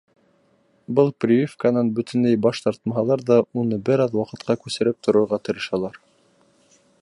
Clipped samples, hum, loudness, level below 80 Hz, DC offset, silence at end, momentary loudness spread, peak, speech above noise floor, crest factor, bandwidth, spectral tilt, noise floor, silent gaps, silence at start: under 0.1%; none; -21 LUFS; -62 dBFS; under 0.1%; 1.05 s; 7 LU; -4 dBFS; 41 dB; 18 dB; 11 kHz; -7 dB/octave; -62 dBFS; none; 0.9 s